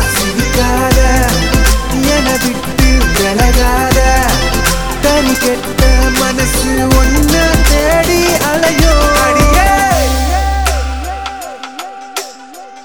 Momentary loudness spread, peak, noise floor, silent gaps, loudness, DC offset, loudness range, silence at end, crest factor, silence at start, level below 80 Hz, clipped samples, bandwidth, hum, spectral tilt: 12 LU; 0 dBFS; -32 dBFS; none; -11 LUFS; under 0.1%; 2 LU; 0 s; 10 dB; 0 s; -14 dBFS; under 0.1%; over 20 kHz; none; -4 dB/octave